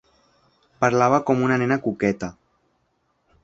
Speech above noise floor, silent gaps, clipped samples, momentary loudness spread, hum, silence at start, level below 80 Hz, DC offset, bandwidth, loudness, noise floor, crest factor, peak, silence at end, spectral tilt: 49 dB; none; under 0.1%; 8 LU; none; 0.8 s; -58 dBFS; under 0.1%; 7.8 kHz; -21 LUFS; -69 dBFS; 22 dB; -2 dBFS; 1.1 s; -6.5 dB/octave